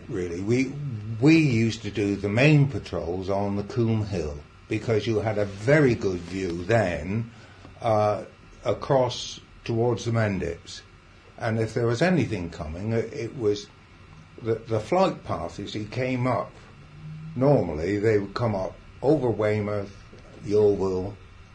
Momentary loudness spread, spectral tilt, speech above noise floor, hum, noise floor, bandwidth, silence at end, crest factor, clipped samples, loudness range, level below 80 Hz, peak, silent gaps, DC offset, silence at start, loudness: 14 LU; -7 dB/octave; 26 dB; none; -50 dBFS; 10 kHz; 0.1 s; 18 dB; under 0.1%; 5 LU; -48 dBFS; -8 dBFS; none; under 0.1%; 0 s; -25 LUFS